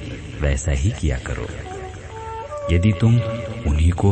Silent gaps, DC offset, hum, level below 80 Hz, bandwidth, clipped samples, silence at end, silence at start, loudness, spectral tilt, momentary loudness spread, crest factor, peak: none; under 0.1%; none; -26 dBFS; 8.8 kHz; under 0.1%; 0 s; 0 s; -21 LUFS; -6.5 dB/octave; 15 LU; 16 dB; -4 dBFS